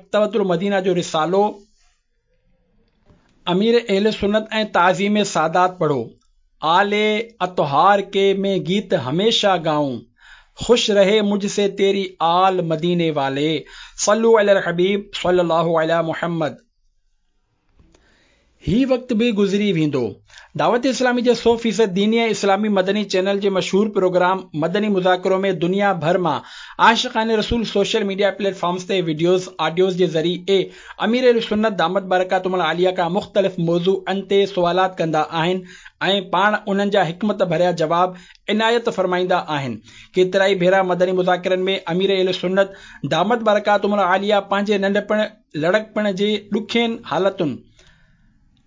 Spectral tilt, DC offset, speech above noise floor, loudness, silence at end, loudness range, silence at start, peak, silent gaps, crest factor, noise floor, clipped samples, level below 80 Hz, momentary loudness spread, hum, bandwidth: -5 dB/octave; under 0.1%; 47 dB; -18 LUFS; 1.1 s; 4 LU; 0.15 s; -2 dBFS; none; 16 dB; -65 dBFS; under 0.1%; -50 dBFS; 7 LU; none; 7.6 kHz